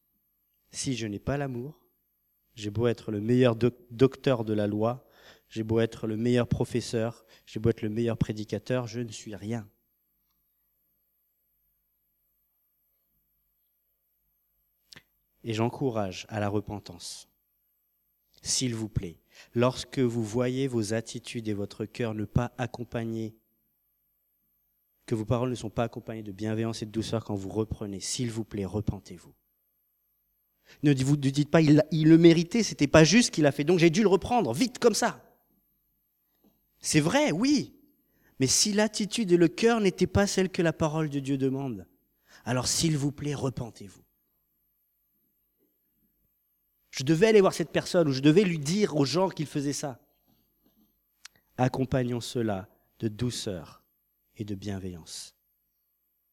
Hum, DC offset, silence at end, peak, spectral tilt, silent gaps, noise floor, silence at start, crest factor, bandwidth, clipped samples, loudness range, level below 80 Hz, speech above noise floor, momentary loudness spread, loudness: 50 Hz at -55 dBFS; under 0.1%; 1.05 s; -4 dBFS; -5 dB/octave; none; -75 dBFS; 0.75 s; 24 dB; 16.5 kHz; under 0.1%; 12 LU; -56 dBFS; 49 dB; 16 LU; -27 LUFS